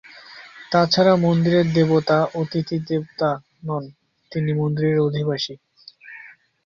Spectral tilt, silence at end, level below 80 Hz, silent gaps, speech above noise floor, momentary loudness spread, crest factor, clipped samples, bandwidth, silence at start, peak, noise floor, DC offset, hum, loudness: -7 dB/octave; 0.4 s; -58 dBFS; none; 26 dB; 24 LU; 18 dB; under 0.1%; 7.2 kHz; 0.15 s; -4 dBFS; -45 dBFS; under 0.1%; none; -20 LUFS